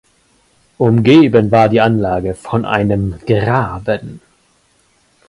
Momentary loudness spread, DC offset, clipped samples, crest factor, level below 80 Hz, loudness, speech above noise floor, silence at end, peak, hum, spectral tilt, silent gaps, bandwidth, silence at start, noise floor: 11 LU; under 0.1%; under 0.1%; 14 dB; -40 dBFS; -13 LUFS; 43 dB; 1.1 s; 0 dBFS; none; -8 dB/octave; none; 11.5 kHz; 0.8 s; -56 dBFS